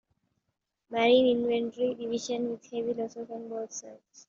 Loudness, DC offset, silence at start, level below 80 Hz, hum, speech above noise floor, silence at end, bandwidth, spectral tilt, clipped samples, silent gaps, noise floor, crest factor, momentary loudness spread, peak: -29 LUFS; under 0.1%; 0.9 s; -72 dBFS; none; 53 dB; 0.1 s; 7.6 kHz; -2.5 dB/octave; under 0.1%; none; -82 dBFS; 18 dB; 15 LU; -12 dBFS